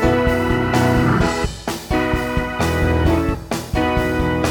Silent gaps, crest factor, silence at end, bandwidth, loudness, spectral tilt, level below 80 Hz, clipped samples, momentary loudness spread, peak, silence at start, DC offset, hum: none; 14 dB; 0 s; 19 kHz; -19 LUFS; -6 dB/octave; -26 dBFS; under 0.1%; 7 LU; -2 dBFS; 0 s; under 0.1%; none